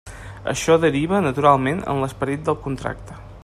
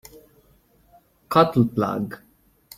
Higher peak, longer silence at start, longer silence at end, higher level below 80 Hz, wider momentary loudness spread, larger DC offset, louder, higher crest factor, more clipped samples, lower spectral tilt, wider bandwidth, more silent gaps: about the same, -2 dBFS vs -2 dBFS; second, 0.05 s vs 1.3 s; second, 0.05 s vs 0.6 s; first, -42 dBFS vs -56 dBFS; about the same, 14 LU vs 15 LU; neither; about the same, -20 LUFS vs -21 LUFS; about the same, 20 dB vs 22 dB; neither; second, -5.5 dB/octave vs -7.5 dB/octave; second, 14 kHz vs 16 kHz; neither